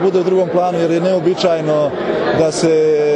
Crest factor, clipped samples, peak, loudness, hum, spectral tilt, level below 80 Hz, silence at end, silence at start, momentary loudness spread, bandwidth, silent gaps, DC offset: 10 dB; under 0.1%; -2 dBFS; -15 LUFS; none; -5.5 dB/octave; -54 dBFS; 0 s; 0 s; 3 LU; 11 kHz; none; under 0.1%